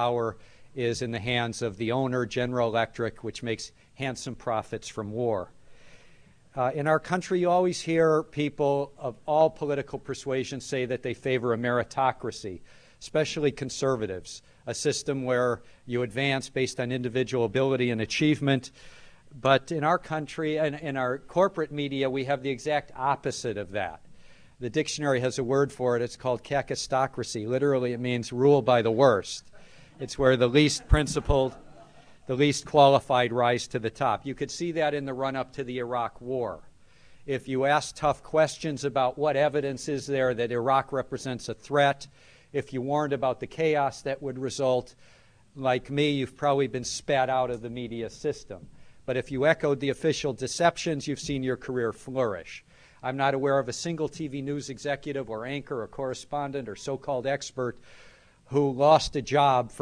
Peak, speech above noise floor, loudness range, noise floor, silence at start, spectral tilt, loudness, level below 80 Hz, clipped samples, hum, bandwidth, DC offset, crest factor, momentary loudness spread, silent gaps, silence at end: -6 dBFS; 27 dB; 6 LU; -54 dBFS; 0 s; -5 dB/octave; -27 LUFS; -46 dBFS; under 0.1%; none; 11 kHz; under 0.1%; 22 dB; 12 LU; none; 0 s